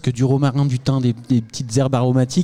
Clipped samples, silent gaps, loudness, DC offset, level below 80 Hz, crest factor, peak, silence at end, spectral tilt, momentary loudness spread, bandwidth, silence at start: under 0.1%; none; -19 LUFS; under 0.1%; -50 dBFS; 12 dB; -6 dBFS; 0 s; -7 dB/octave; 4 LU; 10.5 kHz; 0.05 s